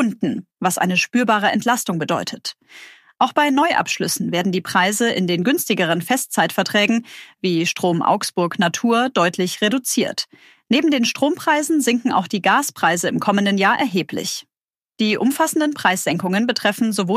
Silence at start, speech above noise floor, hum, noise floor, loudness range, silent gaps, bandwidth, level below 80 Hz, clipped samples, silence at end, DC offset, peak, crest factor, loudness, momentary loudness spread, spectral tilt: 0 s; over 71 dB; none; under -90 dBFS; 2 LU; 14.63-14.68 s; 15.5 kHz; -70 dBFS; under 0.1%; 0 s; under 0.1%; -2 dBFS; 16 dB; -18 LUFS; 6 LU; -4 dB/octave